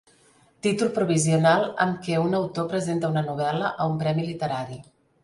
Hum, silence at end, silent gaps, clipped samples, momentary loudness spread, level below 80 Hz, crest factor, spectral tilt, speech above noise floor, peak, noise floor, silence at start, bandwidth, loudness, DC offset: none; 0.4 s; none; under 0.1%; 9 LU; -62 dBFS; 18 dB; -5.5 dB/octave; 35 dB; -6 dBFS; -59 dBFS; 0.65 s; 11.5 kHz; -24 LUFS; under 0.1%